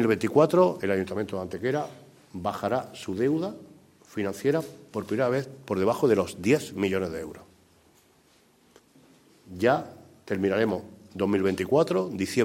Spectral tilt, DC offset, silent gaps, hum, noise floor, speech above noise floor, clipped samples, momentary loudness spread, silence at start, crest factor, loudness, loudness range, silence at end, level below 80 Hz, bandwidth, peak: -6.5 dB/octave; under 0.1%; none; none; -61 dBFS; 35 dB; under 0.1%; 13 LU; 0 s; 20 dB; -27 LUFS; 5 LU; 0 s; -64 dBFS; 16 kHz; -6 dBFS